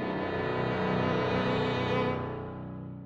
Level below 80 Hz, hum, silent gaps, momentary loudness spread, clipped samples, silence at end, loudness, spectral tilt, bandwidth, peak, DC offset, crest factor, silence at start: -54 dBFS; none; none; 11 LU; under 0.1%; 0 s; -30 LUFS; -7.5 dB/octave; 7.8 kHz; -16 dBFS; under 0.1%; 14 dB; 0 s